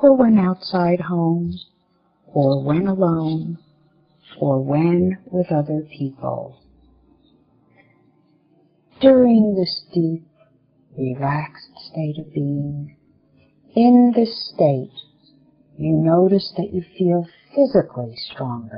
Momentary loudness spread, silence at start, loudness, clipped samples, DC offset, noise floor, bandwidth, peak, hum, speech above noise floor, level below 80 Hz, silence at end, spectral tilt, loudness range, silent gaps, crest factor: 16 LU; 0 s; -19 LUFS; under 0.1%; under 0.1%; -63 dBFS; 5.4 kHz; 0 dBFS; none; 45 dB; -56 dBFS; 0 s; -7.5 dB/octave; 9 LU; none; 18 dB